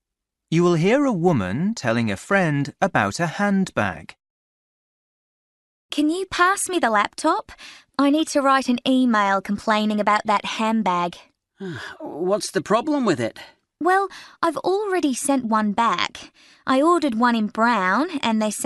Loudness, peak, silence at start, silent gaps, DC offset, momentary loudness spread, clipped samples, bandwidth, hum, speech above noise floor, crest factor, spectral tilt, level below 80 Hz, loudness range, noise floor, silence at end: -21 LUFS; -2 dBFS; 0.5 s; 4.30-5.89 s; under 0.1%; 10 LU; under 0.1%; 12 kHz; none; 62 dB; 18 dB; -5 dB/octave; -60 dBFS; 4 LU; -83 dBFS; 0 s